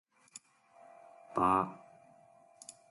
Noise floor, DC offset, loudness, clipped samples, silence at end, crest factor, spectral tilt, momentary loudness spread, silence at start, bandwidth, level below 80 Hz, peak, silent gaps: -62 dBFS; under 0.1%; -32 LUFS; under 0.1%; 0.2 s; 24 dB; -5.5 dB/octave; 27 LU; 1.35 s; 11.5 kHz; -68 dBFS; -16 dBFS; none